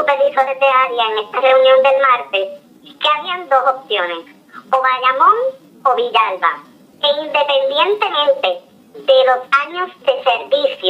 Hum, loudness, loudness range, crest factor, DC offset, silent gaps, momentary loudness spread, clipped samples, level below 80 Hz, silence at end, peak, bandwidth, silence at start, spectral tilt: none; -15 LUFS; 2 LU; 14 dB; under 0.1%; none; 9 LU; under 0.1%; -78 dBFS; 0 s; -2 dBFS; 7.8 kHz; 0 s; -2.5 dB/octave